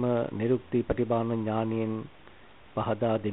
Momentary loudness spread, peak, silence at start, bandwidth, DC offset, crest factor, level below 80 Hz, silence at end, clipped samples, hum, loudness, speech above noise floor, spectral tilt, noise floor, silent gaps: 8 LU; -12 dBFS; 0 s; 4 kHz; 0.2%; 16 dB; -52 dBFS; 0 s; under 0.1%; none; -29 LUFS; 26 dB; -7.5 dB/octave; -54 dBFS; none